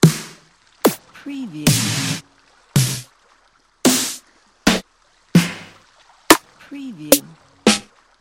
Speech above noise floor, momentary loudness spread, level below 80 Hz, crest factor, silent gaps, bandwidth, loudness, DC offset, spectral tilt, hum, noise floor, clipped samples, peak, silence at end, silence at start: 37 dB; 18 LU; -48 dBFS; 20 dB; none; 17 kHz; -18 LUFS; under 0.1%; -4 dB/octave; none; -57 dBFS; under 0.1%; 0 dBFS; 0.4 s; 0 s